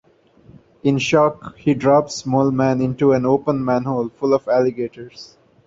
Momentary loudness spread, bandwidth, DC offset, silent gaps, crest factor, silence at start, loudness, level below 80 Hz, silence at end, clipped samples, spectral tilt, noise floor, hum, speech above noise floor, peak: 8 LU; 7.8 kHz; under 0.1%; none; 16 dB; 0.85 s; -18 LUFS; -54 dBFS; 0.4 s; under 0.1%; -6.5 dB/octave; -50 dBFS; none; 32 dB; -4 dBFS